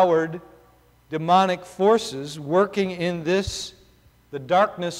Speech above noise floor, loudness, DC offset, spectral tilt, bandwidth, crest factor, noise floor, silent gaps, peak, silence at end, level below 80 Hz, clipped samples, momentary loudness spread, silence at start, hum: 34 dB; -22 LUFS; under 0.1%; -5 dB/octave; 16 kHz; 16 dB; -56 dBFS; none; -6 dBFS; 0 s; -50 dBFS; under 0.1%; 15 LU; 0 s; none